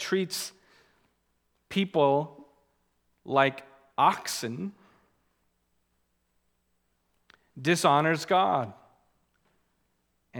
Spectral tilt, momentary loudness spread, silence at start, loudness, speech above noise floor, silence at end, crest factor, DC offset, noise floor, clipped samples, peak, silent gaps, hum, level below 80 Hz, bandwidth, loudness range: -4.5 dB/octave; 16 LU; 0 s; -27 LUFS; 48 dB; 0 s; 24 dB; under 0.1%; -74 dBFS; under 0.1%; -6 dBFS; none; none; -76 dBFS; 19.5 kHz; 7 LU